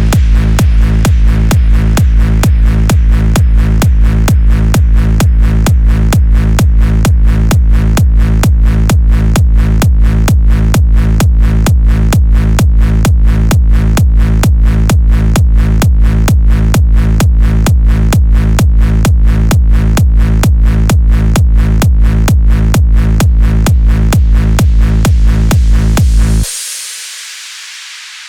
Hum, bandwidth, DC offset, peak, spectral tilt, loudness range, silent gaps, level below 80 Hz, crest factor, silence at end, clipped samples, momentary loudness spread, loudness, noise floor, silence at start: none; 16 kHz; 0.3%; 0 dBFS; -6 dB/octave; 0 LU; none; -8 dBFS; 6 dB; 0 s; under 0.1%; 1 LU; -10 LUFS; -28 dBFS; 0 s